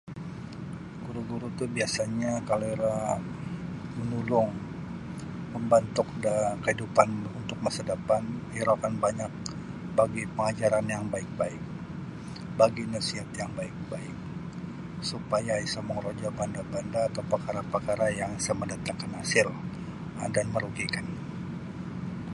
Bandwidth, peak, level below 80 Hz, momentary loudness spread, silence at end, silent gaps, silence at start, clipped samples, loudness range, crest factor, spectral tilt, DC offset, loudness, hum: 11.5 kHz; -4 dBFS; -54 dBFS; 13 LU; 0 s; none; 0.05 s; under 0.1%; 4 LU; 26 dB; -5 dB/octave; under 0.1%; -30 LUFS; none